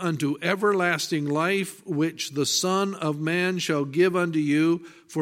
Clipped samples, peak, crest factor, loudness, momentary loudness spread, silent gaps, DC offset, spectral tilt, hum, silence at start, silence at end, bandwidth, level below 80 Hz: under 0.1%; -8 dBFS; 18 dB; -24 LUFS; 5 LU; none; under 0.1%; -4.5 dB/octave; none; 0 s; 0 s; 16 kHz; -74 dBFS